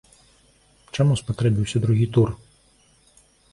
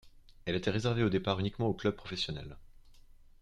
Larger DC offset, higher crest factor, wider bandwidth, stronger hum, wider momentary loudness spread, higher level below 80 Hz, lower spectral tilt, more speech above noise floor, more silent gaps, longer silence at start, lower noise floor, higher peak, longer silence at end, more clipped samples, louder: neither; about the same, 18 dB vs 20 dB; about the same, 11.5 kHz vs 10.5 kHz; first, 50 Hz at -50 dBFS vs none; second, 8 LU vs 11 LU; first, -48 dBFS vs -54 dBFS; about the same, -7 dB/octave vs -6.5 dB/octave; first, 38 dB vs 24 dB; neither; first, 0.95 s vs 0.05 s; about the same, -58 dBFS vs -56 dBFS; first, -6 dBFS vs -16 dBFS; first, 1.15 s vs 0.45 s; neither; first, -22 LUFS vs -34 LUFS